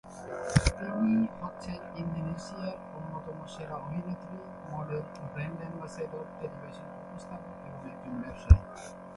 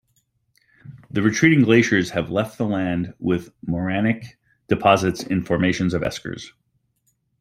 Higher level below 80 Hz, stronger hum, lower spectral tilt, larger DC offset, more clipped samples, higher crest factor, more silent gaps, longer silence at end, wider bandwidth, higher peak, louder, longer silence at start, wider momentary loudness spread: first, -36 dBFS vs -52 dBFS; neither; about the same, -6.5 dB/octave vs -6 dB/octave; neither; neither; first, 28 dB vs 20 dB; neither; second, 0 s vs 0.9 s; second, 11.5 kHz vs 15 kHz; about the same, -4 dBFS vs -2 dBFS; second, -34 LUFS vs -21 LUFS; second, 0.05 s vs 0.85 s; first, 16 LU vs 13 LU